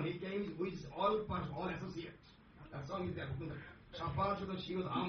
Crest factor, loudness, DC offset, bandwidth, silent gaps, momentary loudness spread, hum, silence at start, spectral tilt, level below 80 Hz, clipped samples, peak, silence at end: 18 dB; -41 LUFS; under 0.1%; 6.4 kHz; none; 15 LU; none; 0 s; -5.5 dB/octave; -62 dBFS; under 0.1%; -22 dBFS; 0 s